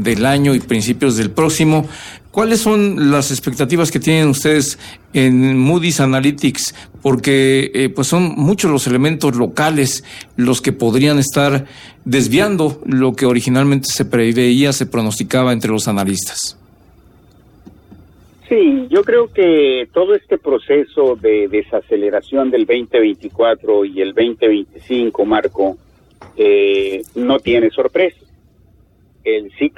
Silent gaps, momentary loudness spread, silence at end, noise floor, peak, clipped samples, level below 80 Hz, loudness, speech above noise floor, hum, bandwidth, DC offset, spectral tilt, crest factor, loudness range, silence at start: none; 7 LU; 0.1 s; -50 dBFS; -2 dBFS; under 0.1%; -48 dBFS; -14 LUFS; 36 dB; none; 17.5 kHz; under 0.1%; -5 dB/octave; 12 dB; 3 LU; 0 s